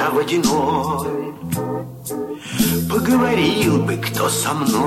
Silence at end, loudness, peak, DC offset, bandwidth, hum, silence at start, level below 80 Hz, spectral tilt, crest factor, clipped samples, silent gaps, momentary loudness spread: 0 s; -19 LUFS; -4 dBFS; under 0.1%; 16.5 kHz; none; 0 s; -46 dBFS; -4.5 dB/octave; 16 dB; under 0.1%; none; 11 LU